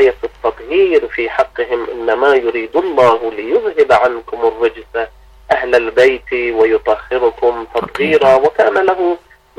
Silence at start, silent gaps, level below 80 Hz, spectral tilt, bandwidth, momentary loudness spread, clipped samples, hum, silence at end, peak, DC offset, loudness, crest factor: 0 s; none; -44 dBFS; -5.5 dB/octave; 10.5 kHz; 9 LU; under 0.1%; none; 0.4 s; -2 dBFS; under 0.1%; -14 LUFS; 12 dB